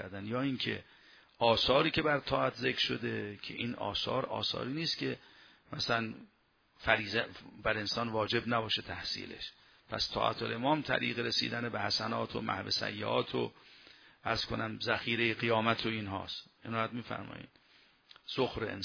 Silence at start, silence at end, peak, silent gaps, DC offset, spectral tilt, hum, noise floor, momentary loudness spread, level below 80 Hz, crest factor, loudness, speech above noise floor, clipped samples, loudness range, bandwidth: 0 s; 0 s; -10 dBFS; none; under 0.1%; -5 dB/octave; none; -65 dBFS; 12 LU; -60 dBFS; 26 dB; -33 LUFS; 31 dB; under 0.1%; 4 LU; 5.4 kHz